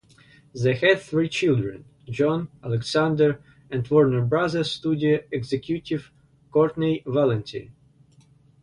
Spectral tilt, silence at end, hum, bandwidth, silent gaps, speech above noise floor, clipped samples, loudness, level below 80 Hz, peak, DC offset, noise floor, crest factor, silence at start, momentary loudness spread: -6.5 dB/octave; 0.9 s; none; 11 kHz; none; 33 dB; under 0.1%; -23 LUFS; -56 dBFS; -4 dBFS; under 0.1%; -56 dBFS; 20 dB; 0.55 s; 12 LU